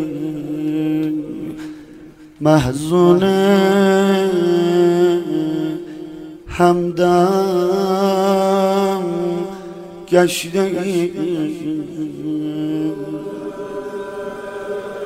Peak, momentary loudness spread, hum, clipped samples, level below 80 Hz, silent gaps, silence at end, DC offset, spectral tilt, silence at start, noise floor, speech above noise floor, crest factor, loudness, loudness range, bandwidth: 0 dBFS; 15 LU; none; under 0.1%; -48 dBFS; none; 0 s; under 0.1%; -6.5 dB/octave; 0 s; -40 dBFS; 25 dB; 18 dB; -17 LUFS; 8 LU; 16 kHz